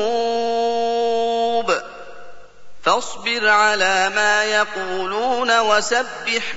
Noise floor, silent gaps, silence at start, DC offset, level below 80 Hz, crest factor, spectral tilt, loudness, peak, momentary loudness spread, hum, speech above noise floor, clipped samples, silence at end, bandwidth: -39 dBFS; none; 0 s; 2%; -60 dBFS; 16 dB; -1.5 dB/octave; -18 LUFS; -4 dBFS; 7 LU; 50 Hz at -60 dBFS; 20 dB; under 0.1%; 0 s; 8 kHz